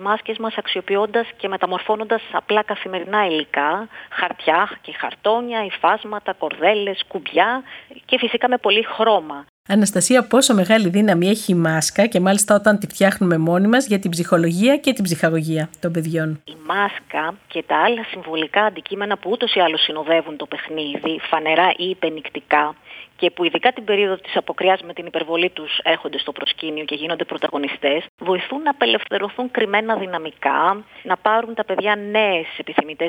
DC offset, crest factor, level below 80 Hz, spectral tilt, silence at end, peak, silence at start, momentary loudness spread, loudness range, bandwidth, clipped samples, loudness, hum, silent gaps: under 0.1%; 18 dB; -64 dBFS; -4 dB/octave; 0 s; 0 dBFS; 0 s; 9 LU; 5 LU; 17 kHz; under 0.1%; -19 LUFS; none; 9.49-9.65 s, 28.09-28.18 s